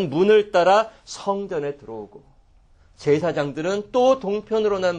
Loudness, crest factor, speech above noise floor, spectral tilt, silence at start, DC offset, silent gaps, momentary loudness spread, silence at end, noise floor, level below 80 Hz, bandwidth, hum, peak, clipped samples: -21 LUFS; 16 dB; 33 dB; -5.5 dB/octave; 0 s; under 0.1%; none; 13 LU; 0 s; -54 dBFS; -56 dBFS; 9.4 kHz; none; -6 dBFS; under 0.1%